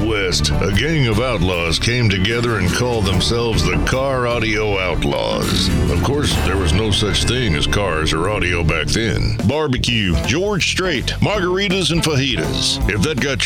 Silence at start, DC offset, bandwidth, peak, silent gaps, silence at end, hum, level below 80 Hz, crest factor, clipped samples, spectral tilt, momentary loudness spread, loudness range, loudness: 0 s; under 0.1%; 17 kHz; -2 dBFS; none; 0 s; none; -26 dBFS; 16 dB; under 0.1%; -4.5 dB/octave; 2 LU; 1 LU; -17 LUFS